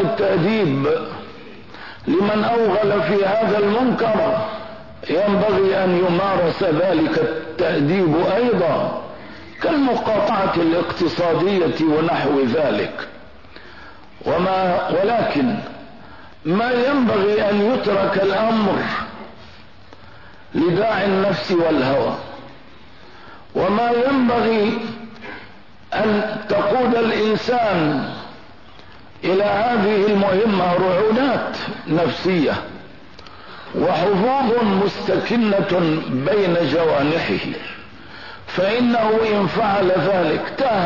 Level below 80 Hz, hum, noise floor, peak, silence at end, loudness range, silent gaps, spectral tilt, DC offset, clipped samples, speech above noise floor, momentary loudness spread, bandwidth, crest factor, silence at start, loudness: -52 dBFS; none; -44 dBFS; -8 dBFS; 0 s; 3 LU; none; -7.5 dB/octave; 0.8%; under 0.1%; 27 dB; 16 LU; 6 kHz; 10 dB; 0 s; -18 LUFS